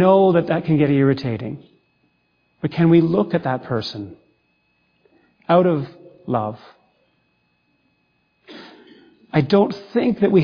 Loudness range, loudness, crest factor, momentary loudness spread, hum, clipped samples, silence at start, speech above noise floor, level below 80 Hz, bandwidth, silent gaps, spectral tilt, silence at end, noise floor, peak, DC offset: 11 LU; -19 LUFS; 18 dB; 22 LU; 60 Hz at -50 dBFS; under 0.1%; 0 s; 49 dB; -58 dBFS; 5.2 kHz; none; -9 dB/octave; 0 s; -66 dBFS; -2 dBFS; under 0.1%